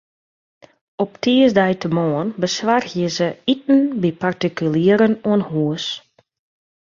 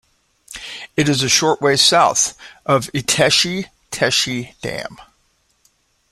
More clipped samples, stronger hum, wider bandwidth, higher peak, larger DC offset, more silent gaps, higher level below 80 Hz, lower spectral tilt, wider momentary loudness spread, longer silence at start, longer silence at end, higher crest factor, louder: neither; neither; second, 7.4 kHz vs 16 kHz; about the same, -2 dBFS vs 0 dBFS; neither; neither; second, -60 dBFS vs -52 dBFS; first, -6 dB/octave vs -2.5 dB/octave; second, 8 LU vs 18 LU; first, 1 s vs 0.5 s; second, 0.85 s vs 1.1 s; about the same, 16 dB vs 20 dB; about the same, -18 LUFS vs -16 LUFS